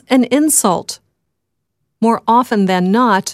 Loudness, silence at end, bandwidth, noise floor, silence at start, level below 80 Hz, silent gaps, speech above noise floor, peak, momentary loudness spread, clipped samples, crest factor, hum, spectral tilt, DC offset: -13 LUFS; 0 s; 16 kHz; -74 dBFS; 0.1 s; -60 dBFS; none; 61 dB; 0 dBFS; 8 LU; under 0.1%; 14 dB; none; -4 dB/octave; under 0.1%